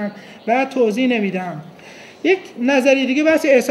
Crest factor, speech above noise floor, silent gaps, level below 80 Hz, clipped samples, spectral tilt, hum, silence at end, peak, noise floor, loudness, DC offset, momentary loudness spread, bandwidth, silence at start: 16 dB; 23 dB; none; -68 dBFS; under 0.1%; -5 dB/octave; none; 0 s; -2 dBFS; -40 dBFS; -17 LUFS; under 0.1%; 14 LU; 14 kHz; 0 s